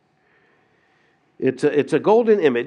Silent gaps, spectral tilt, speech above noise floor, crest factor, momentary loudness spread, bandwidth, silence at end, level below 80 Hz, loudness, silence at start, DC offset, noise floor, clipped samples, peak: none; -6.5 dB/octave; 44 dB; 16 dB; 8 LU; 10 kHz; 0 s; -78 dBFS; -18 LUFS; 1.4 s; under 0.1%; -61 dBFS; under 0.1%; -4 dBFS